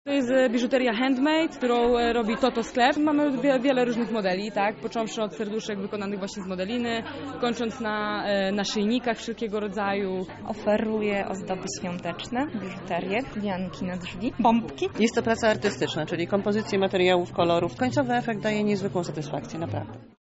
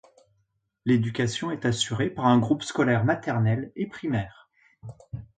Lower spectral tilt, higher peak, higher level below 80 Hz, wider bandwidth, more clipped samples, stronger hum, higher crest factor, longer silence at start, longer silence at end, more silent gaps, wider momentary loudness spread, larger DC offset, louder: second, -4 dB/octave vs -6 dB/octave; about the same, -8 dBFS vs -8 dBFS; about the same, -54 dBFS vs -56 dBFS; second, 8 kHz vs 9.2 kHz; neither; neither; about the same, 18 dB vs 18 dB; second, 0.05 s vs 0.85 s; about the same, 0.15 s vs 0.15 s; neither; second, 9 LU vs 18 LU; neither; about the same, -26 LUFS vs -25 LUFS